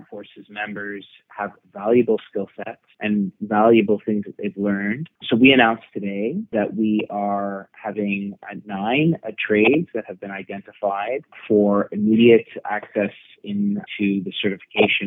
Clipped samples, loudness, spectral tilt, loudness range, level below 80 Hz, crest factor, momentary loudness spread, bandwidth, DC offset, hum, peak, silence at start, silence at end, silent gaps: under 0.1%; -21 LUFS; -9.5 dB/octave; 5 LU; -66 dBFS; 20 dB; 16 LU; 4 kHz; under 0.1%; none; 0 dBFS; 0 s; 0 s; none